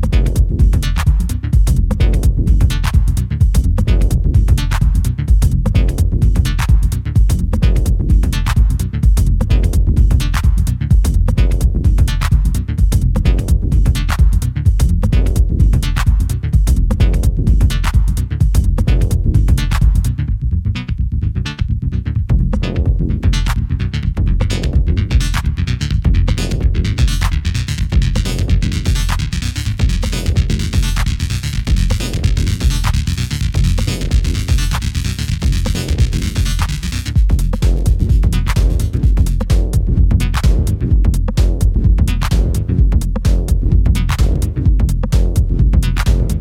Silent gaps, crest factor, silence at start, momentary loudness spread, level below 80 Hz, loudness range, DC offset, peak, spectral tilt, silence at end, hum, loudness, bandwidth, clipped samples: none; 12 dB; 0 s; 4 LU; -14 dBFS; 3 LU; under 0.1%; 0 dBFS; -6 dB/octave; 0 s; none; -16 LUFS; 15.5 kHz; under 0.1%